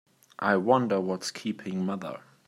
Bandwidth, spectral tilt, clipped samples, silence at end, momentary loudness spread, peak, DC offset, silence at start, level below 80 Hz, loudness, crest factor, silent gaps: 13.5 kHz; -5.5 dB/octave; under 0.1%; 0.3 s; 11 LU; -8 dBFS; under 0.1%; 0.4 s; -76 dBFS; -28 LUFS; 20 dB; none